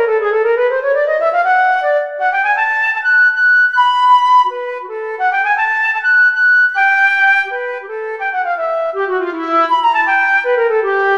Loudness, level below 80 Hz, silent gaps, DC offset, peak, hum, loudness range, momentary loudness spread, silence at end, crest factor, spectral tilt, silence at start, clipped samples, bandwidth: -13 LUFS; -66 dBFS; none; 0.2%; -2 dBFS; none; 3 LU; 9 LU; 0 s; 12 dB; -1.5 dB/octave; 0 s; under 0.1%; 10.5 kHz